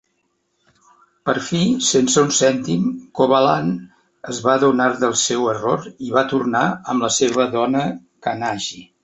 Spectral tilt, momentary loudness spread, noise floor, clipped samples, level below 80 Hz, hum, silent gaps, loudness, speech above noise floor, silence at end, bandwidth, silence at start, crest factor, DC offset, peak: -4 dB/octave; 11 LU; -68 dBFS; under 0.1%; -58 dBFS; none; none; -18 LUFS; 50 dB; 0.2 s; 8.4 kHz; 1.25 s; 16 dB; under 0.1%; -2 dBFS